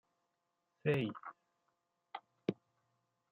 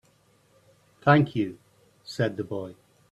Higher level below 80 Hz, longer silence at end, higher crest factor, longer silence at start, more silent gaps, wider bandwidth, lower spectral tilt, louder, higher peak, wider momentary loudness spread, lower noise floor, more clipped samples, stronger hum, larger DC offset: second, -82 dBFS vs -64 dBFS; first, 0.8 s vs 0.4 s; about the same, 24 dB vs 24 dB; second, 0.85 s vs 1.05 s; neither; second, 7.2 kHz vs 11.5 kHz; second, -6 dB/octave vs -7.5 dB/octave; second, -39 LUFS vs -26 LUFS; second, -20 dBFS vs -4 dBFS; about the same, 18 LU vs 19 LU; first, -85 dBFS vs -63 dBFS; neither; neither; neither